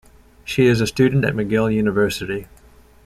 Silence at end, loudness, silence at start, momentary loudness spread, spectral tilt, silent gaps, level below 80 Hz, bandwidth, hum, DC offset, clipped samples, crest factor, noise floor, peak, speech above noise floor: 0.6 s; -19 LUFS; 0.45 s; 11 LU; -6 dB/octave; none; -44 dBFS; 15.5 kHz; none; under 0.1%; under 0.1%; 16 dB; -48 dBFS; -4 dBFS; 31 dB